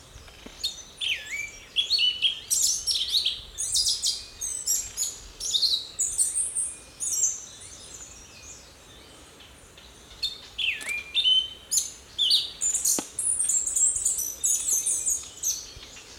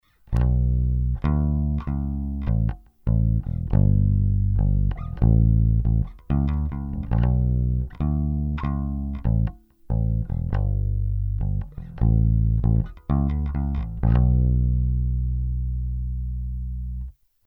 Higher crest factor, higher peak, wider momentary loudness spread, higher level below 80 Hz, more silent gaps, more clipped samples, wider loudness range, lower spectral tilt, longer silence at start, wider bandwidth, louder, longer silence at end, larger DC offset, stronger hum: about the same, 20 dB vs 16 dB; about the same, -8 dBFS vs -6 dBFS; first, 19 LU vs 9 LU; second, -56 dBFS vs -26 dBFS; neither; neither; first, 9 LU vs 4 LU; second, 2 dB/octave vs -11.5 dB/octave; second, 0 s vs 0.3 s; first, 19 kHz vs 3.8 kHz; about the same, -24 LUFS vs -24 LUFS; second, 0 s vs 0.35 s; neither; neither